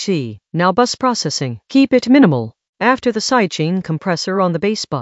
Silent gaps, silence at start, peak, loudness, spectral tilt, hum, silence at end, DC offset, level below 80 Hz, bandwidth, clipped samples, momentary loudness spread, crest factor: 2.69-2.73 s; 0 s; 0 dBFS; -16 LUFS; -5 dB/octave; none; 0 s; under 0.1%; -56 dBFS; 8.2 kHz; under 0.1%; 9 LU; 16 dB